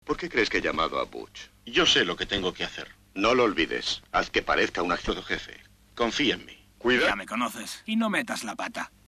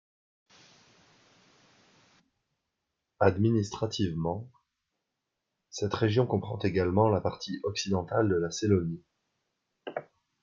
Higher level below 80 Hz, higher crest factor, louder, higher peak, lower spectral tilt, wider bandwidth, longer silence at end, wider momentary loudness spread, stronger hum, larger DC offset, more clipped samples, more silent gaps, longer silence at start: first, -48 dBFS vs -64 dBFS; about the same, 18 dB vs 22 dB; first, -26 LUFS vs -29 LUFS; about the same, -10 dBFS vs -8 dBFS; second, -3 dB/octave vs -6 dB/octave; first, 13.5 kHz vs 7.6 kHz; second, 0.2 s vs 0.4 s; second, 12 LU vs 15 LU; neither; neither; neither; neither; second, 0.05 s vs 3.2 s